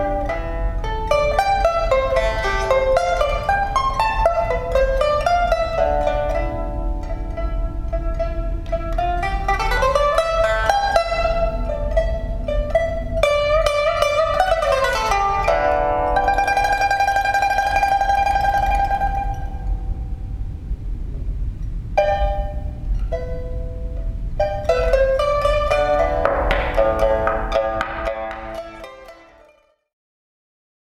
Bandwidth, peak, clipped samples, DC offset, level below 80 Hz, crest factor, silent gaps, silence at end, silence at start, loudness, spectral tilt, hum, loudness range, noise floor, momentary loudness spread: 13.5 kHz; 0 dBFS; under 0.1%; under 0.1%; -26 dBFS; 20 dB; none; 1.8 s; 0 s; -20 LUFS; -5 dB/octave; none; 7 LU; -55 dBFS; 12 LU